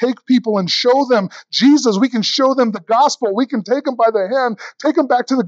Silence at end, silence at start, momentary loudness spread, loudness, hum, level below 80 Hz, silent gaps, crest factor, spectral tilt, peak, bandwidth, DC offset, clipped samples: 0 s; 0 s; 6 LU; -15 LUFS; none; -78 dBFS; none; 14 dB; -4.5 dB/octave; -2 dBFS; 7.8 kHz; under 0.1%; under 0.1%